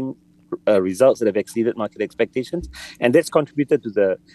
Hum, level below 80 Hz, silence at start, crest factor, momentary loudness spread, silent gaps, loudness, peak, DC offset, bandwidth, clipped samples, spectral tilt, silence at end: none; -50 dBFS; 0 s; 18 dB; 13 LU; none; -20 LUFS; -2 dBFS; under 0.1%; 12.5 kHz; under 0.1%; -6 dB/octave; 0.2 s